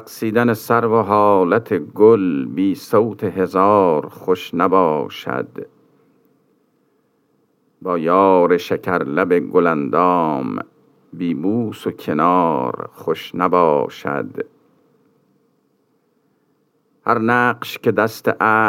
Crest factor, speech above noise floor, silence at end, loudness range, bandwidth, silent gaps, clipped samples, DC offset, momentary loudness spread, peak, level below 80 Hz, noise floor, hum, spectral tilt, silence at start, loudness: 18 dB; 46 dB; 0 s; 7 LU; 16.5 kHz; none; under 0.1%; under 0.1%; 12 LU; 0 dBFS; -70 dBFS; -63 dBFS; none; -7 dB/octave; 0 s; -17 LUFS